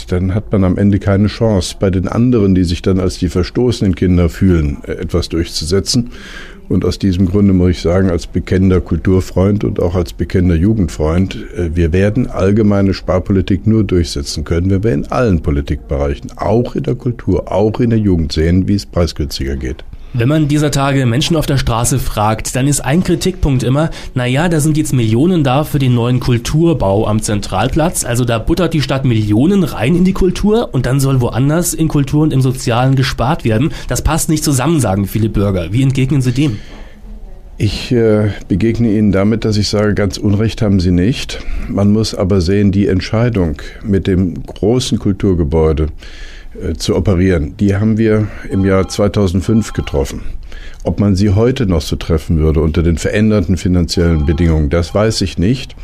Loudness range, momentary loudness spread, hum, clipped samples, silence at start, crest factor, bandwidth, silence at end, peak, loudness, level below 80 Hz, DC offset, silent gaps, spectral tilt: 2 LU; 6 LU; none; under 0.1%; 0 s; 10 dB; 15.5 kHz; 0 s; -4 dBFS; -14 LUFS; -26 dBFS; under 0.1%; none; -6.5 dB/octave